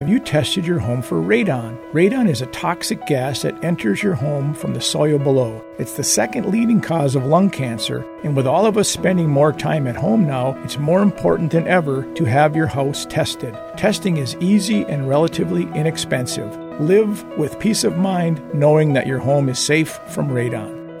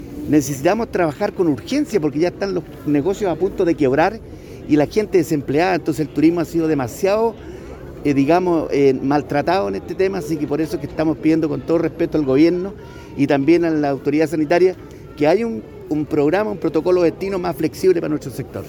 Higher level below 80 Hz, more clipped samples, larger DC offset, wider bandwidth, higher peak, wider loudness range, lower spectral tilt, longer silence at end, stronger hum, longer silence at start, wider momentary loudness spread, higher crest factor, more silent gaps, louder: second, -50 dBFS vs -44 dBFS; neither; neither; second, 16 kHz vs 19 kHz; about the same, -2 dBFS vs -4 dBFS; about the same, 2 LU vs 2 LU; about the same, -5.5 dB/octave vs -6.5 dB/octave; about the same, 0 s vs 0 s; neither; about the same, 0 s vs 0 s; about the same, 8 LU vs 9 LU; about the same, 16 dB vs 14 dB; neither; about the same, -18 LUFS vs -18 LUFS